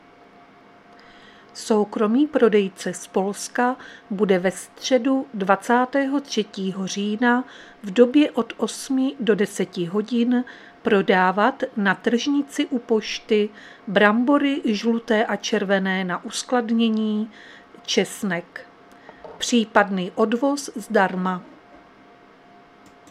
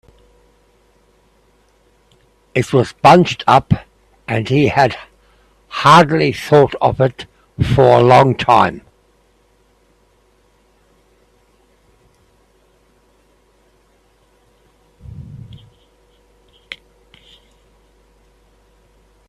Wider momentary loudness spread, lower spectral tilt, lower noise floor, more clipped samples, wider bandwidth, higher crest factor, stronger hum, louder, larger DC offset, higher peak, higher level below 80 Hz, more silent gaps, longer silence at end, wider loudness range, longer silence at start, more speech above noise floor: second, 10 LU vs 26 LU; second, -4.5 dB/octave vs -6.5 dB/octave; second, -50 dBFS vs -56 dBFS; neither; about the same, 13.5 kHz vs 13.5 kHz; about the same, 22 dB vs 18 dB; neither; second, -22 LUFS vs -13 LUFS; neither; about the same, 0 dBFS vs 0 dBFS; second, -68 dBFS vs -44 dBFS; neither; second, 1.65 s vs 2.55 s; about the same, 3 LU vs 5 LU; second, 1.55 s vs 2.55 s; second, 28 dB vs 44 dB